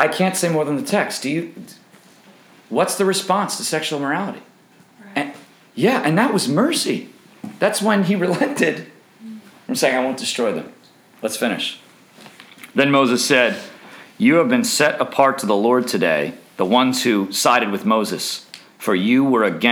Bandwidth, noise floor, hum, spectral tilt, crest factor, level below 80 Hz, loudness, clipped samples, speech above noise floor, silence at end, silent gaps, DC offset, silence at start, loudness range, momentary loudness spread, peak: over 20 kHz; -51 dBFS; none; -4 dB/octave; 18 dB; -72 dBFS; -18 LUFS; under 0.1%; 33 dB; 0 s; none; under 0.1%; 0 s; 5 LU; 14 LU; 0 dBFS